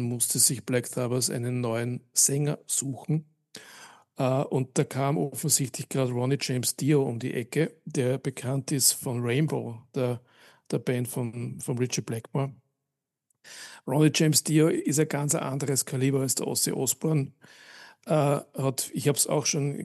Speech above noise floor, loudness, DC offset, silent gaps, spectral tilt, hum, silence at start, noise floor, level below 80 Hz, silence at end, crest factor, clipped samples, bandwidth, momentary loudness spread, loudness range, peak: 59 dB; -26 LUFS; under 0.1%; none; -4.5 dB/octave; none; 0 s; -85 dBFS; -78 dBFS; 0 s; 20 dB; under 0.1%; 13 kHz; 10 LU; 6 LU; -6 dBFS